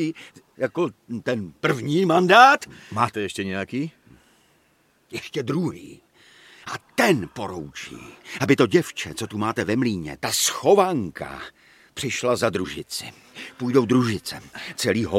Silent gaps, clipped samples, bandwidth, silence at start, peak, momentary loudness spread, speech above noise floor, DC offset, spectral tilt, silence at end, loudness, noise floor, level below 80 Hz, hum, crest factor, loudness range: none; under 0.1%; 16.5 kHz; 0 s; -2 dBFS; 18 LU; 40 dB; under 0.1%; -4.5 dB/octave; 0 s; -22 LUFS; -63 dBFS; -58 dBFS; none; 22 dB; 9 LU